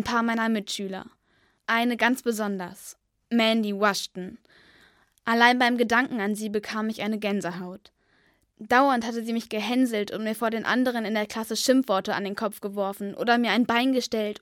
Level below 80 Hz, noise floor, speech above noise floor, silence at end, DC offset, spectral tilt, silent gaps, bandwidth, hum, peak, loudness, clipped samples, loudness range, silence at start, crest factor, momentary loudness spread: -66 dBFS; -67 dBFS; 41 dB; 0.05 s; under 0.1%; -4 dB/octave; none; 17 kHz; none; -2 dBFS; -25 LUFS; under 0.1%; 3 LU; 0 s; 22 dB; 13 LU